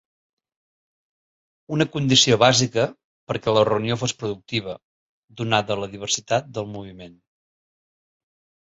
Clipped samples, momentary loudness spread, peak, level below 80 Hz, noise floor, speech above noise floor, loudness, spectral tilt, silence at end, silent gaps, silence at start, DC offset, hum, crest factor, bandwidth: under 0.1%; 16 LU; -2 dBFS; -58 dBFS; under -90 dBFS; over 68 dB; -21 LUFS; -4 dB/octave; 1.55 s; 3.04-3.27 s, 4.83-5.28 s; 1.7 s; under 0.1%; none; 22 dB; 8 kHz